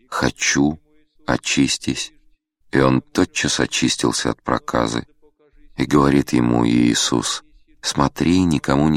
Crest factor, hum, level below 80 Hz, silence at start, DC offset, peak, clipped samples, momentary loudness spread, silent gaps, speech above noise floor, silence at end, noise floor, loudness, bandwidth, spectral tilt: 20 dB; none; -42 dBFS; 0.1 s; under 0.1%; 0 dBFS; under 0.1%; 10 LU; none; 38 dB; 0 s; -56 dBFS; -19 LUFS; 15 kHz; -4 dB/octave